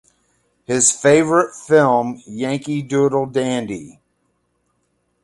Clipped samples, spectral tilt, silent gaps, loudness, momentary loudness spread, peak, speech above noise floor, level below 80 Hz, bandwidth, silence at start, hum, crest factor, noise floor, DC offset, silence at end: under 0.1%; -4 dB/octave; none; -17 LUFS; 12 LU; 0 dBFS; 51 dB; -58 dBFS; 11.5 kHz; 0.7 s; none; 18 dB; -67 dBFS; under 0.1%; 1.35 s